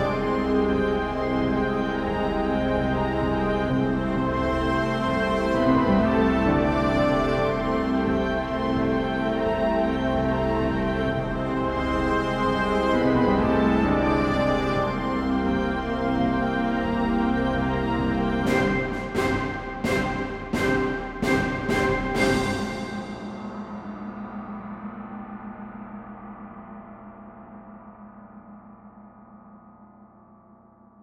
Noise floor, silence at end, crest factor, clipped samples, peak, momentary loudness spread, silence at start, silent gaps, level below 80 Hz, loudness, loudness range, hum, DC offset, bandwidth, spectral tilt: -53 dBFS; 0.95 s; 16 dB; under 0.1%; -8 dBFS; 16 LU; 0 s; none; -38 dBFS; -24 LUFS; 15 LU; none; under 0.1%; 14 kHz; -7 dB/octave